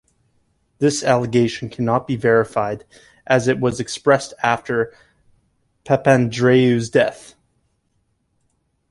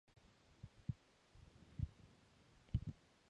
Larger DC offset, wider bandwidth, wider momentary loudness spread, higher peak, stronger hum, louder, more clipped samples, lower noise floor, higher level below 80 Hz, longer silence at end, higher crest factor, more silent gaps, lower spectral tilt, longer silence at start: neither; first, 11.5 kHz vs 9.6 kHz; second, 8 LU vs 21 LU; first, -2 dBFS vs -26 dBFS; neither; first, -18 LUFS vs -50 LUFS; neither; about the same, -67 dBFS vs -70 dBFS; about the same, -54 dBFS vs -58 dBFS; first, 1.75 s vs 0.4 s; second, 18 dB vs 26 dB; neither; second, -5.5 dB/octave vs -8 dB/octave; first, 0.8 s vs 0.65 s